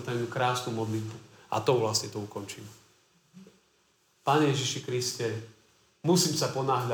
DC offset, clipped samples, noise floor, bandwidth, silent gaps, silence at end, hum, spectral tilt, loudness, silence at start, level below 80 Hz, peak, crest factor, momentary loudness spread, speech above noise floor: under 0.1%; under 0.1%; -68 dBFS; over 20 kHz; none; 0 s; none; -4.5 dB/octave; -29 LUFS; 0 s; -74 dBFS; -12 dBFS; 20 dB; 16 LU; 39 dB